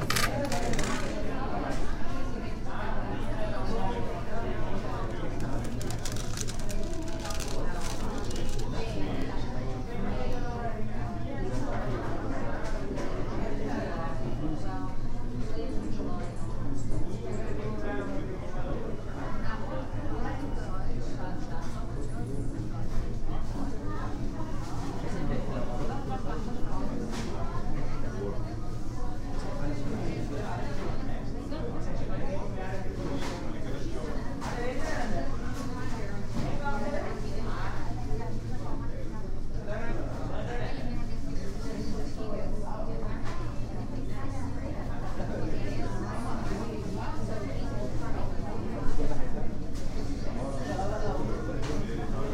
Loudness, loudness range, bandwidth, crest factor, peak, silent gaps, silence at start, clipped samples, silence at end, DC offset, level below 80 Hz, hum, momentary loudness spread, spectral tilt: -35 LUFS; 2 LU; 12.5 kHz; 18 dB; -10 dBFS; none; 0 s; under 0.1%; 0 s; under 0.1%; -32 dBFS; none; 4 LU; -6 dB/octave